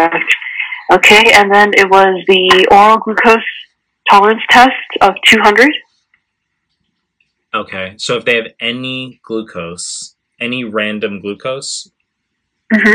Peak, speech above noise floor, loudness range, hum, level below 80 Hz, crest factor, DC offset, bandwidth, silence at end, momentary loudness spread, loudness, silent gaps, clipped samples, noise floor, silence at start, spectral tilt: 0 dBFS; 60 dB; 13 LU; none; -48 dBFS; 12 dB; under 0.1%; 18 kHz; 0 s; 17 LU; -9 LUFS; none; 1%; -71 dBFS; 0 s; -3 dB/octave